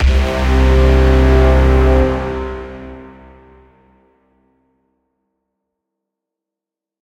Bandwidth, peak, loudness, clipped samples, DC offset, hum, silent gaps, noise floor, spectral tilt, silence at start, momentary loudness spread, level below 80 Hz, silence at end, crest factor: 8 kHz; 0 dBFS; -13 LUFS; under 0.1%; under 0.1%; none; none; -86 dBFS; -7.5 dB/octave; 0 s; 18 LU; -16 dBFS; 4 s; 14 dB